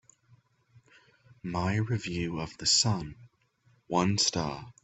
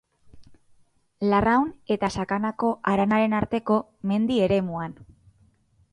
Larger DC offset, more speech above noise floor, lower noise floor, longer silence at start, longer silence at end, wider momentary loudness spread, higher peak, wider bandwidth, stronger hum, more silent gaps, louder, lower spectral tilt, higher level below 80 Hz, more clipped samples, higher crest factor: neither; about the same, 38 dB vs 38 dB; first, -67 dBFS vs -62 dBFS; first, 1.45 s vs 0.35 s; second, 0.15 s vs 0.9 s; first, 13 LU vs 7 LU; second, -12 dBFS vs -6 dBFS; second, 8.4 kHz vs 10.5 kHz; neither; neither; second, -28 LUFS vs -24 LUFS; second, -3.5 dB/octave vs -7 dB/octave; second, -58 dBFS vs -50 dBFS; neither; about the same, 20 dB vs 18 dB